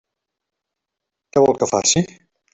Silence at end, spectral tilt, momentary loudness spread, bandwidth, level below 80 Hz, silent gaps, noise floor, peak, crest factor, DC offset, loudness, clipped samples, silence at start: 0.5 s; -3.5 dB/octave; 6 LU; 8.4 kHz; -54 dBFS; none; -82 dBFS; -2 dBFS; 18 dB; under 0.1%; -17 LUFS; under 0.1%; 1.35 s